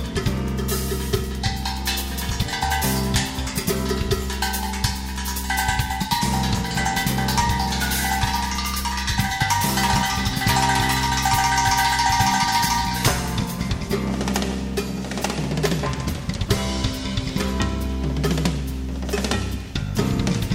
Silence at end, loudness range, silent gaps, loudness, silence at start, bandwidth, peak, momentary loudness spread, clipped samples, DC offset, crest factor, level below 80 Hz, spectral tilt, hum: 0 s; 5 LU; none; -22 LUFS; 0 s; 16.5 kHz; -4 dBFS; 8 LU; under 0.1%; under 0.1%; 18 dB; -30 dBFS; -4 dB/octave; none